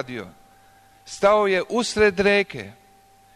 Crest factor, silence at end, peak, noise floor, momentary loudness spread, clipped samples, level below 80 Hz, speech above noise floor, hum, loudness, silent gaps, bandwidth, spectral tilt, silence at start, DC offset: 16 dB; 0.65 s; -6 dBFS; -54 dBFS; 19 LU; under 0.1%; -50 dBFS; 33 dB; 50 Hz at -50 dBFS; -20 LUFS; none; 13 kHz; -4 dB/octave; 0 s; under 0.1%